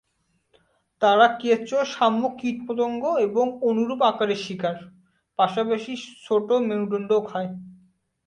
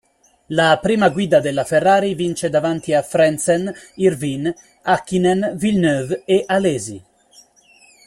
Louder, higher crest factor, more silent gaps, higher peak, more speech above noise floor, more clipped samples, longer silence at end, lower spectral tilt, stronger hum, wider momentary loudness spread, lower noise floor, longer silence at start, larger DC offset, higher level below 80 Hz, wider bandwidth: second, -23 LUFS vs -18 LUFS; about the same, 20 dB vs 16 dB; neither; about the same, -4 dBFS vs -2 dBFS; first, 48 dB vs 34 dB; neither; second, 0.55 s vs 1.05 s; about the same, -5.5 dB/octave vs -5 dB/octave; neither; about the same, 11 LU vs 9 LU; first, -71 dBFS vs -51 dBFS; first, 1 s vs 0.5 s; neither; second, -70 dBFS vs -54 dBFS; second, 9.8 kHz vs 14.5 kHz